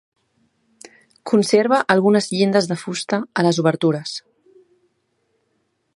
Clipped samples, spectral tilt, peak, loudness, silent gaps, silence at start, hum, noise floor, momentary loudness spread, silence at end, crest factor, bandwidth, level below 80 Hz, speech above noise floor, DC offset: under 0.1%; -5 dB/octave; 0 dBFS; -18 LUFS; none; 1.25 s; none; -69 dBFS; 10 LU; 1.75 s; 20 dB; 11.5 kHz; -68 dBFS; 51 dB; under 0.1%